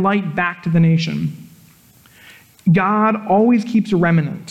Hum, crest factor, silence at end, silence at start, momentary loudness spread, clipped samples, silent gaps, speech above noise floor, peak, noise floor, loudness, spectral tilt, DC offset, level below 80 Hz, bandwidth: none; 12 dB; 0 s; 0 s; 8 LU; under 0.1%; none; 33 dB; -4 dBFS; -49 dBFS; -16 LUFS; -8 dB/octave; under 0.1%; -56 dBFS; 12 kHz